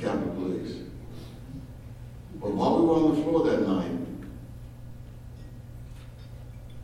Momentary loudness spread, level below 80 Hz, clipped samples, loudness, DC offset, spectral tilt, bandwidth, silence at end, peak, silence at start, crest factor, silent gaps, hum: 22 LU; -48 dBFS; under 0.1%; -26 LUFS; under 0.1%; -8 dB/octave; 14 kHz; 0 s; -10 dBFS; 0 s; 18 dB; none; none